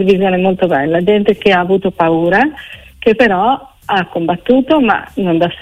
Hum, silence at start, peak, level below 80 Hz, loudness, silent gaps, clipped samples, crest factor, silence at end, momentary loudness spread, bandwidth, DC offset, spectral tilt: none; 0 s; 0 dBFS; -44 dBFS; -13 LUFS; none; under 0.1%; 12 dB; 0 s; 6 LU; 12.5 kHz; under 0.1%; -7.5 dB/octave